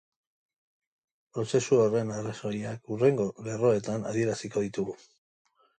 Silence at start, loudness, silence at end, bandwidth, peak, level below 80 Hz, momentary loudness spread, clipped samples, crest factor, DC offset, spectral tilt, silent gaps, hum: 1.35 s; -29 LUFS; 0.85 s; 9.4 kHz; -12 dBFS; -68 dBFS; 12 LU; under 0.1%; 18 dB; under 0.1%; -6 dB/octave; none; none